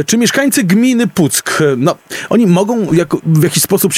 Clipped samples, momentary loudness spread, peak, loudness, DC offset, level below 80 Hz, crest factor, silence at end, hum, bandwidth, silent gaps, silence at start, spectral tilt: under 0.1%; 4 LU; 0 dBFS; -12 LUFS; under 0.1%; -50 dBFS; 12 dB; 0 s; none; 16.5 kHz; none; 0 s; -4.5 dB/octave